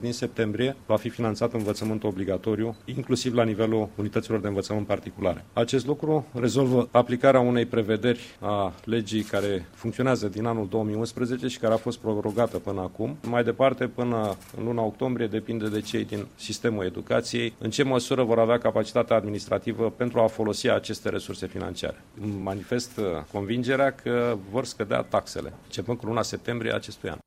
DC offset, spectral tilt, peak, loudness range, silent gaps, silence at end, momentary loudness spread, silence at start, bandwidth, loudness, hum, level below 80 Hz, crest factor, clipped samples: under 0.1%; -6 dB/octave; -4 dBFS; 5 LU; none; 0.1 s; 9 LU; 0 s; 15.5 kHz; -27 LUFS; none; -56 dBFS; 22 dB; under 0.1%